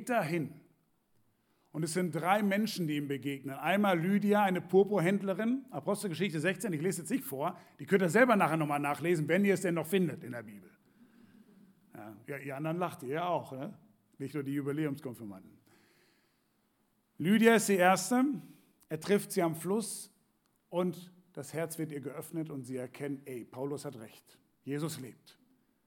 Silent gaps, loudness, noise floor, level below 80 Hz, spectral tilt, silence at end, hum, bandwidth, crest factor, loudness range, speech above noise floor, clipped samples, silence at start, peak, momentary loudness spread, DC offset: none; -32 LUFS; -75 dBFS; -86 dBFS; -5.5 dB/octave; 0.75 s; none; 18.5 kHz; 22 dB; 11 LU; 43 dB; under 0.1%; 0 s; -12 dBFS; 18 LU; under 0.1%